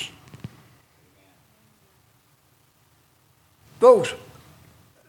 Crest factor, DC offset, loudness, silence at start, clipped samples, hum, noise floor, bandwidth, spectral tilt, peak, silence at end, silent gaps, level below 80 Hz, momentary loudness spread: 24 dB; under 0.1%; -18 LUFS; 0 s; under 0.1%; none; -61 dBFS; 12.5 kHz; -4.5 dB/octave; -2 dBFS; 0.9 s; none; -66 dBFS; 27 LU